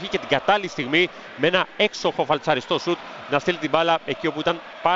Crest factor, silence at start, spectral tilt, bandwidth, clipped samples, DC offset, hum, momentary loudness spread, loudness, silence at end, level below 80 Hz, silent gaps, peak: 20 dB; 0 s; -4.5 dB/octave; 7.8 kHz; under 0.1%; under 0.1%; none; 5 LU; -22 LUFS; 0 s; -58 dBFS; none; -4 dBFS